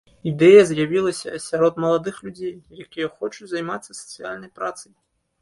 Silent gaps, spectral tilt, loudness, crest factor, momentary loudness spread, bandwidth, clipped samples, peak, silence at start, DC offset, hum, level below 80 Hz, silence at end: none; -5.5 dB/octave; -19 LUFS; 20 dB; 21 LU; 11.5 kHz; under 0.1%; -2 dBFS; 0.25 s; under 0.1%; none; -62 dBFS; 0.6 s